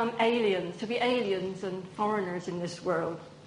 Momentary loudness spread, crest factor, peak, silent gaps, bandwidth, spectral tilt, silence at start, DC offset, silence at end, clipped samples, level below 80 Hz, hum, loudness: 9 LU; 18 dB; -12 dBFS; none; 10.5 kHz; -5.5 dB/octave; 0 s; under 0.1%; 0 s; under 0.1%; -68 dBFS; none; -30 LUFS